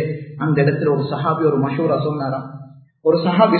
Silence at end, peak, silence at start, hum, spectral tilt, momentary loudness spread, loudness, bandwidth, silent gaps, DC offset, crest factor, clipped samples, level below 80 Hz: 0 s; 0 dBFS; 0 s; none; -12.5 dB/octave; 9 LU; -19 LUFS; 4.5 kHz; none; under 0.1%; 18 dB; under 0.1%; -58 dBFS